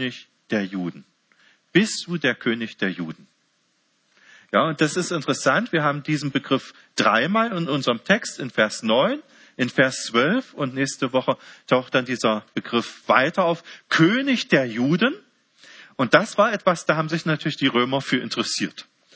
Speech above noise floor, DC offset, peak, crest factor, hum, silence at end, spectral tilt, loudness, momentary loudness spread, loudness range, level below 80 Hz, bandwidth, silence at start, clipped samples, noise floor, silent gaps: 45 dB; under 0.1%; 0 dBFS; 22 dB; none; 0.35 s; -4.5 dB/octave; -22 LUFS; 9 LU; 5 LU; -70 dBFS; 8 kHz; 0 s; under 0.1%; -67 dBFS; none